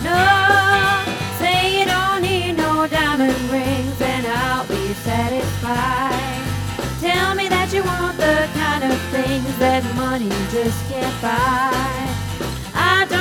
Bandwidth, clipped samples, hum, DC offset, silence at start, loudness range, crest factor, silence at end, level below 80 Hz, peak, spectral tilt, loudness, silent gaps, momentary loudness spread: 20 kHz; under 0.1%; none; under 0.1%; 0 s; 4 LU; 16 dB; 0 s; -36 dBFS; -2 dBFS; -4.5 dB/octave; -18 LUFS; none; 8 LU